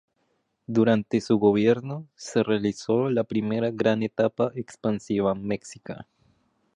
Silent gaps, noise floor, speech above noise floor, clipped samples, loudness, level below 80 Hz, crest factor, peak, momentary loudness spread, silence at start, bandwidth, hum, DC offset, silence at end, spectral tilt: none; -72 dBFS; 48 dB; under 0.1%; -25 LUFS; -62 dBFS; 18 dB; -8 dBFS; 13 LU; 0.7 s; 10 kHz; none; under 0.1%; 0.75 s; -6.5 dB/octave